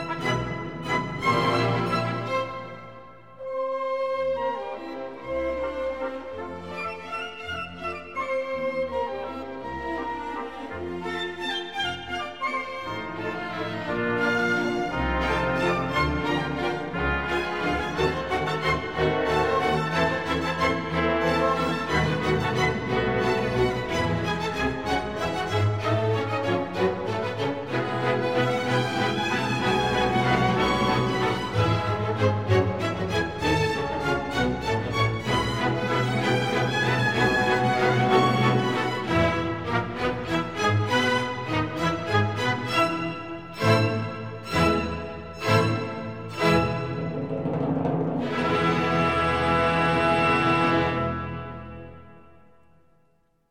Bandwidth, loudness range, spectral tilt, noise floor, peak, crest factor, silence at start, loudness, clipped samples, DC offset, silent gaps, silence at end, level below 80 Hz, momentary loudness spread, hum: 16 kHz; 8 LU; -6 dB/octave; -67 dBFS; -8 dBFS; 18 dB; 0 s; -25 LUFS; under 0.1%; 0.3%; none; 1.3 s; -44 dBFS; 11 LU; none